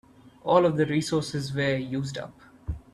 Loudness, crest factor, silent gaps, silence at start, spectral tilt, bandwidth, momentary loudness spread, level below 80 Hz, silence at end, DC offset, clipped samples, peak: -26 LUFS; 22 dB; none; 0.25 s; -6 dB/octave; 13 kHz; 17 LU; -48 dBFS; 0.15 s; under 0.1%; under 0.1%; -6 dBFS